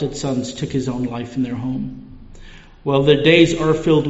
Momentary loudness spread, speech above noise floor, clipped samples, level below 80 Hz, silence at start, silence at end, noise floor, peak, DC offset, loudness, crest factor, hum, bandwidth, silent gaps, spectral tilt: 15 LU; 22 dB; under 0.1%; -40 dBFS; 0 s; 0 s; -40 dBFS; 0 dBFS; under 0.1%; -18 LUFS; 18 dB; none; 8 kHz; none; -5 dB/octave